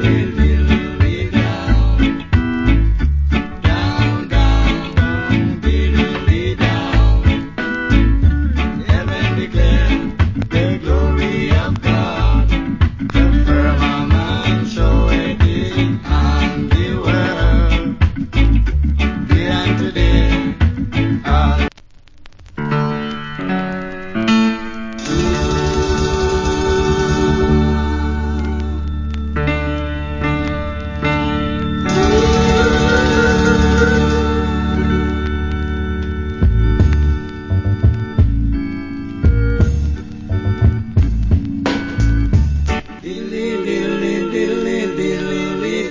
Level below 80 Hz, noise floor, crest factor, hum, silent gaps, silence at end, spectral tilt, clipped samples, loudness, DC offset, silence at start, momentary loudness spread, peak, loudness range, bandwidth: -18 dBFS; -41 dBFS; 14 dB; none; none; 0 s; -6.5 dB/octave; under 0.1%; -16 LUFS; under 0.1%; 0 s; 7 LU; 0 dBFS; 4 LU; 7.6 kHz